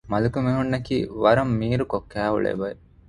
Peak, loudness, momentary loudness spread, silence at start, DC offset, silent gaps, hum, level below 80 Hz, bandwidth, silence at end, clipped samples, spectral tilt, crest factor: -4 dBFS; -23 LUFS; 8 LU; 0.05 s; under 0.1%; none; none; -46 dBFS; 10.5 kHz; 0.3 s; under 0.1%; -8 dB/octave; 20 dB